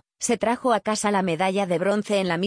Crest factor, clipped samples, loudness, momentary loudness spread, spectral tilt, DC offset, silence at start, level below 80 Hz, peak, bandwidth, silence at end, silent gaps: 14 dB; under 0.1%; -23 LUFS; 1 LU; -4.5 dB/octave; under 0.1%; 0.2 s; -62 dBFS; -8 dBFS; 10.5 kHz; 0 s; none